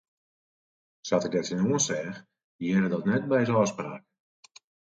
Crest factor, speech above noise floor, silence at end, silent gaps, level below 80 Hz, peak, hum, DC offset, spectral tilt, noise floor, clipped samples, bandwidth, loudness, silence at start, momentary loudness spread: 18 dB; over 64 dB; 0.95 s; 2.44-2.59 s; -68 dBFS; -12 dBFS; none; under 0.1%; -5 dB/octave; under -90 dBFS; under 0.1%; 9.2 kHz; -27 LUFS; 1.05 s; 14 LU